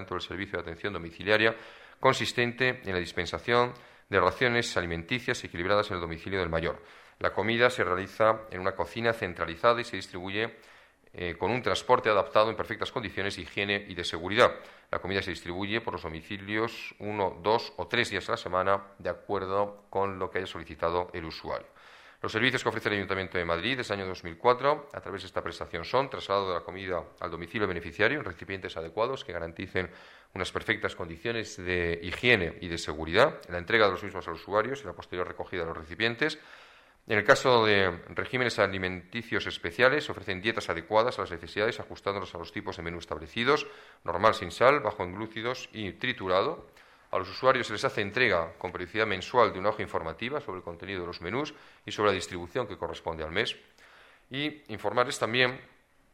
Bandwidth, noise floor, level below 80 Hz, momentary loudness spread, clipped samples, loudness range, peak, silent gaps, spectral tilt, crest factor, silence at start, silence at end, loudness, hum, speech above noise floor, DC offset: 15 kHz; -56 dBFS; -56 dBFS; 12 LU; under 0.1%; 5 LU; -6 dBFS; none; -4.5 dB/octave; 24 dB; 0 s; 0.5 s; -29 LUFS; none; 27 dB; under 0.1%